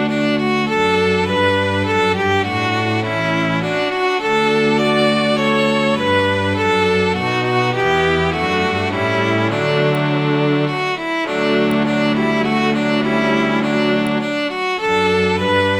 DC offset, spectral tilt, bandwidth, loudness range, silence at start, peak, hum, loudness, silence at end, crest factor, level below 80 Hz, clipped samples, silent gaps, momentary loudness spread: under 0.1%; -6 dB/octave; 14 kHz; 1 LU; 0 s; -4 dBFS; none; -16 LUFS; 0 s; 14 dB; -46 dBFS; under 0.1%; none; 3 LU